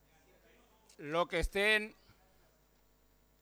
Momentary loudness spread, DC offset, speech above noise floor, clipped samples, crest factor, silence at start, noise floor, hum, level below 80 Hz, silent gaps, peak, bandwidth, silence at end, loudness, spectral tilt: 16 LU; under 0.1%; 36 dB; under 0.1%; 20 dB; 1 s; -70 dBFS; 50 Hz at -65 dBFS; -50 dBFS; none; -18 dBFS; over 20 kHz; 1.5 s; -32 LUFS; -3.5 dB/octave